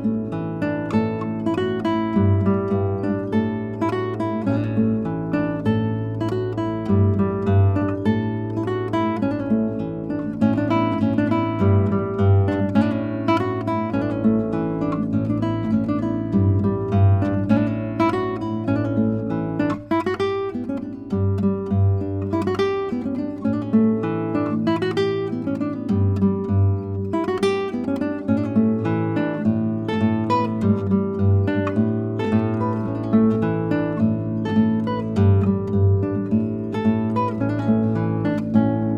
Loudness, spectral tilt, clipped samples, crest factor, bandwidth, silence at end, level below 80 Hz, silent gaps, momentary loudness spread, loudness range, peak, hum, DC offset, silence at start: -21 LUFS; -9.5 dB/octave; under 0.1%; 16 dB; 6.8 kHz; 0 s; -50 dBFS; none; 6 LU; 2 LU; -4 dBFS; none; under 0.1%; 0 s